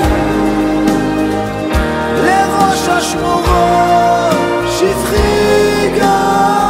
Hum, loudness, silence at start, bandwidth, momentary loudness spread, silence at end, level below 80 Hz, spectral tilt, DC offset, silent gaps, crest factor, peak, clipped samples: none; -12 LUFS; 0 s; 16.5 kHz; 4 LU; 0 s; -24 dBFS; -5 dB/octave; under 0.1%; none; 12 dB; 0 dBFS; under 0.1%